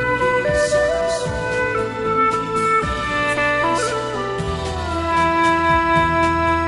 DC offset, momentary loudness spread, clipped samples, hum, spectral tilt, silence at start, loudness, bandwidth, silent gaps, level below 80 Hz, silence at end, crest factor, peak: under 0.1%; 7 LU; under 0.1%; none; -5 dB/octave; 0 s; -18 LUFS; 11.5 kHz; none; -36 dBFS; 0 s; 14 dB; -4 dBFS